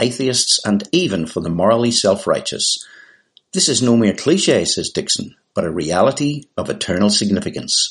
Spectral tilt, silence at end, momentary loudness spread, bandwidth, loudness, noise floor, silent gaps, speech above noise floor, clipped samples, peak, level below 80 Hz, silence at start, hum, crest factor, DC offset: -3.5 dB/octave; 0 s; 8 LU; 11.5 kHz; -17 LUFS; -51 dBFS; none; 34 dB; under 0.1%; -2 dBFS; -52 dBFS; 0 s; none; 16 dB; under 0.1%